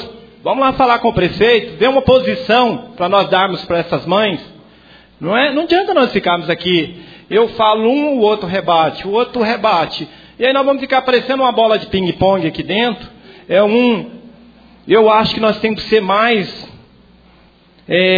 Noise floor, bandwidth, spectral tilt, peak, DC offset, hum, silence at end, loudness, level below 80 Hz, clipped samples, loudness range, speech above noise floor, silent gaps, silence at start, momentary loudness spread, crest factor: -48 dBFS; 5 kHz; -7 dB/octave; 0 dBFS; under 0.1%; none; 0 s; -14 LUFS; -44 dBFS; under 0.1%; 2 LU; 34 dB; none; 0 s; 7 LU; 14 dB